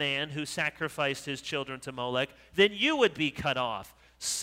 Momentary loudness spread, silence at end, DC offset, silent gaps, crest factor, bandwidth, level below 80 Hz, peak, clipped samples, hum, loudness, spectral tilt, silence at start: 10 LU; 0 s; under 0.1%; none; 20 dB; 16 kHz; -62 dBFS; -10 dBFS; under 0.1%; none; -30 LUFS; -3 dB/octave; 0 s